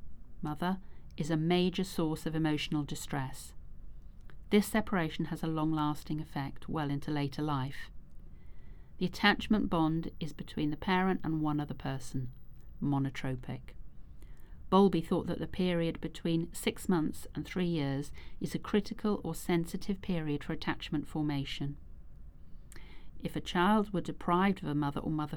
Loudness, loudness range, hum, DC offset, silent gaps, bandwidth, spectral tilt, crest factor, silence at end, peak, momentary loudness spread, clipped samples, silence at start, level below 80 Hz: -34 LUFS; 5 LU; none; under 0.1%; none; over 20 kHz; -6 dB/octave; 22 dB; 0 s; -12 dBFS; 12 LU; under 0.1%; 0 s; -50 dBFS